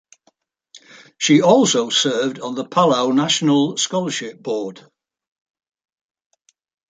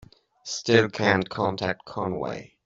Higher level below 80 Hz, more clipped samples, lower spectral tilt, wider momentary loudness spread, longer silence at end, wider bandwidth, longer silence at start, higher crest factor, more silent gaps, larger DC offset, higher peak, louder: second, -68 dBFS vs -60 dBFS; neither; about the same, -4 dB/octave vs -5 dB/octave; about the same, 12 LU vs 13 LU; first, 2.2 s vs 0.2 s; first, 9.4 kHz vs 7.8 kHz; first, 0.75 s vs 0.45 s; about the same, 18 dB vs 22 dB; neither; neither; about the same, -2 dBFS vs -4 dBFS; first, -17 LUFS vs -25 LUFS